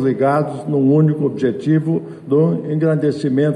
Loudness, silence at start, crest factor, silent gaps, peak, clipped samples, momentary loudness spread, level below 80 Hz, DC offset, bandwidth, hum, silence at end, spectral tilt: -17 LUFS; 0 s; 12 dB; none; -4 dBFS; under 0.1%; 5 LU; -62 dBFS; under 0.1%; 9.8 kHz; none; 0 s; -9.5 dB/octave